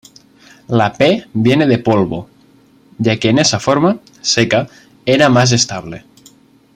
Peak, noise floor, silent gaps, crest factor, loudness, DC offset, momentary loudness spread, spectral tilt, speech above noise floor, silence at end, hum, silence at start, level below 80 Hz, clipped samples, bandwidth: 0 dBFS; -48 dBFS; none; 14 dB; -13 LUFS; under 0.1%; 13 LU; -4.5 dB/octave; 35 dB; 0.8 s; none; 0.7 s; -50 dBFS; under 0.1%; 11.5 kHz